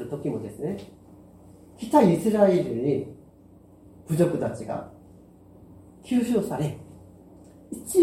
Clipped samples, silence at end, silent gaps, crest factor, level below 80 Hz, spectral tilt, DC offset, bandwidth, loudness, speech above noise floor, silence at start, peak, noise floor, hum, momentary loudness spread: under 0.1%; 0 s; none; 20 dB; -58 dBFS; -7 dB/octave; under 0.1%; 16.5 kHz; -25 LUFS; 28 dB; 0 s; -6 dBFS; -52 dBFS; none; 21 LU